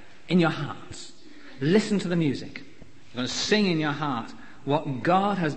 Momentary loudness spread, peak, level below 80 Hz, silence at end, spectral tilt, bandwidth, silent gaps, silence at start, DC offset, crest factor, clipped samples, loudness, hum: 18 LU; -8 dBFS; -60 dBFS; 0 s; -5.5 dB/octave; 8.8 kHz; none; 0.3 s; 0.9%; 18 dB; under 0.1%; -25 LUFS; none